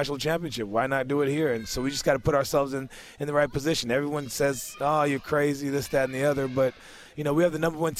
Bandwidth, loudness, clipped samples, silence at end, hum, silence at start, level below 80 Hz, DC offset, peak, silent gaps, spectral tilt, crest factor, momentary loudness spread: 16 kHz; -26 LUFS; under 0.1%; 0 s; none; 0 s; -50 dBFS; under 0.1%; -10 dBFS; none; -5 dB/octave; 16 dB; 6 LU